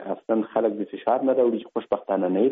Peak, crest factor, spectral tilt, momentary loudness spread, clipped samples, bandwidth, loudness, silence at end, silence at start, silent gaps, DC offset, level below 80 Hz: -8 dBFS; 14 dB; -6 dB/octave; 7 LU; under 0.1%; 3.9 kHz; -24 LUFS; 0 s; 0 s; none; under 0.1%; -72 dBFS